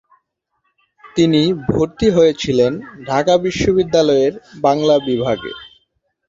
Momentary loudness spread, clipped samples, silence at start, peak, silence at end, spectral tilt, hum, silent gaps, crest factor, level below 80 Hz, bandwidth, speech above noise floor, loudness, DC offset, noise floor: 8 LU; under 0.1%; 1.05 s; -2 dBFS; 0.6 s; -6 dB/octave; none; none; 16 dB; -42 dBFS; 7.8 kHz; 54 dB; -16 LUFS; under 0.1%; -69 dBFS